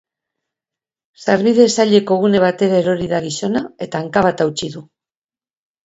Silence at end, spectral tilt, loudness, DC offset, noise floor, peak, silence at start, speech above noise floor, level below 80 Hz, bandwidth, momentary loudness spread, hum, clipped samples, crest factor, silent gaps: 1 s; -5 dB/octave; -16 LUFS; under 0.1%; under -90 dBFS; 0 dBFS; 1.2 s; over 75 dB; -54 dBFS; 8 kHz; 12 LU; none; under 0.1%; 16 dB; none